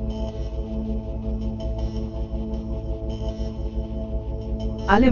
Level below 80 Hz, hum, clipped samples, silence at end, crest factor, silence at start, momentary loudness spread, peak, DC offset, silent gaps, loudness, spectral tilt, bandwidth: -28 dBFS; none; under 0.1%; 0 s; 24 dB; 0 s; 2 LU; 0 dBFS; under 0.1%; none; -28 LUFS; -8 dB/octave; 7 kHz